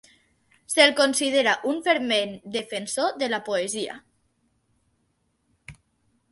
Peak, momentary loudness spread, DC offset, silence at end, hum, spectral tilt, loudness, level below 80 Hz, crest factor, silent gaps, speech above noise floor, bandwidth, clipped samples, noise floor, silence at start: -2 dBFS; 13 LU; under 0.1%; 0.6 s; none; -1.5 dB/octave; -23 LUFS; -68 dBFS; 24 dB; none; 48 dB; 12 kHz; under 0.1%; -71 dBFS; 0.7 s